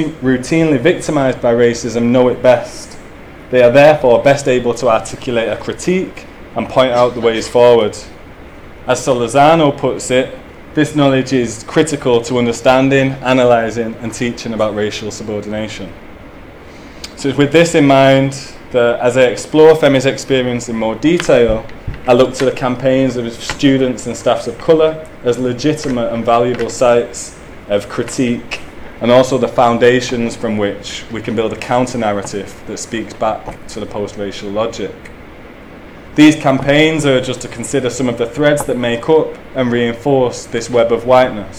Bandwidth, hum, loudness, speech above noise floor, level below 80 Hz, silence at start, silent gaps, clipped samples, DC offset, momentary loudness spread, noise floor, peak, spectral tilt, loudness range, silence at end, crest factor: 14.5 kHz; none; -13 LUFS; 21 dB; -38 dBFS; 0 s; none; 0.2%; under 0.1%; 14 LU; -34 dBFS; 0 dBFS; -5.5 dB/octave; 7 LU; 0 s; 14 dB